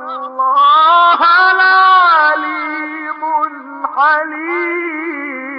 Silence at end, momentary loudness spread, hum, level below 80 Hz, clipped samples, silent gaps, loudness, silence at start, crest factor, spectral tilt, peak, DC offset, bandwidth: 0 s; 14 LU; none; -88 dBFS; under 0.1%; none; -11 LUFS; 0 s; 10 dB; -2.5 dB/octave; -2 dBFS; under 0.1%; 5.8 kHz